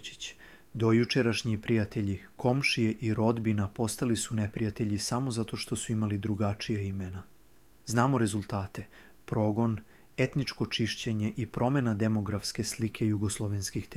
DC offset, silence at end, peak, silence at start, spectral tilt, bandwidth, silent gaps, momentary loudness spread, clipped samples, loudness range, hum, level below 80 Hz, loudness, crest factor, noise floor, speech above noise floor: under 0.1%; 0 s; -10 dBFS; 0 s; -5.5 dB/octave; 15.5 kHz; none; 9 LU; under 0.1%; 4 LU; none; -56 dBFS; -30 LUFS; 20 dB; -62 dBFS; 32 dB